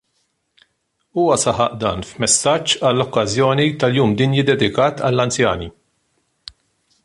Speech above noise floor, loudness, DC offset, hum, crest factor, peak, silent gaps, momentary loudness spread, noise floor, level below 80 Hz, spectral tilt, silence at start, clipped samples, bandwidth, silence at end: 52 dB; -17 LUFS; under 0.1%; none; 18 dB; -2 dBFS; none; 6 LU; -69 dBFS; -46 dBFS; -4 dB/octave; 1.15 s; under 0.1%; 11.5 kHz; 1.35 s